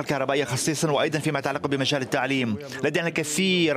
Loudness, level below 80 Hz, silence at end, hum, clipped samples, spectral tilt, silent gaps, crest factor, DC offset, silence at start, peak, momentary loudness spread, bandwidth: -24 LUFS; -64 dBFS; 0 s; none; under 0.1%; -4 dB/octave; none; 18 dB; under 0.1%; 0 s; -8 dBFS; 4 LU; 16 kHz